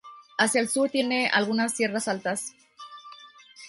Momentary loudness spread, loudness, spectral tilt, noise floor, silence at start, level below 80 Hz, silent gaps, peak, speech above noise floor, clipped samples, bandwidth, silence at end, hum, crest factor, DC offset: 21 LU; -25 LUFS; -2.5 dB/octave; -50 dBFS; 0.05 s; -74 dBFS; none; -8 dBFS; 24 dB; under 0.1%; 12 kHz; 0 s; none; 20 dB; under 0.1%